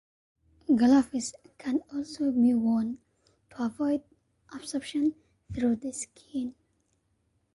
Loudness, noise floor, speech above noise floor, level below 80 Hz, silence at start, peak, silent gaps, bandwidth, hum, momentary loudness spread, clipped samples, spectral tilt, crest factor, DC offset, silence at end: -29 LUFS; -73 dBFS; 46 dB; -60 dBFS; 0.7 s; -12 dBFS; none; 11.5 kHz; none; 16 LU; under 0.1%; -5 dB/octave; 18 dB; under 0.1%; 1.05 s